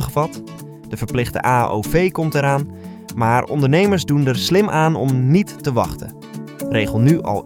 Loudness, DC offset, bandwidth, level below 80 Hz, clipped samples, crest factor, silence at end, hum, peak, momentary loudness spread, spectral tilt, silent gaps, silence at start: -18 LUFS; under 0.1%; 17.5 kHz; -40 dBFS; under 0.1%; 16 dB; 0 s; none; 0 dBFS; 17 LU; -6.5 dB/octave; none; 0 s